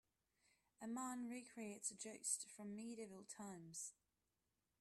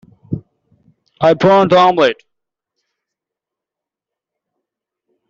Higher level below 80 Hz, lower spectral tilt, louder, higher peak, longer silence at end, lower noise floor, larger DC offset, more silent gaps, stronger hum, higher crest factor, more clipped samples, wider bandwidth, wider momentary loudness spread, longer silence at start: second, under -90 dBFS vs -54 dBFS; second, -3 dB/octave vs -6.5 dB/octave; second, -50 LUFS vs -12 LUFS; second, -28 dBFS vs 0 dBFS; second, 0.9 s vs 3.15 s; first, under -90 dBFS vs -85 dBFS; neither; neither; neither; first, 24 dB vs 16 dB; neither; first, 14.5 kHz vs 7.6 kHz; second, 10 LU vs 18 LU; first, 0.8 s vs 0.3 s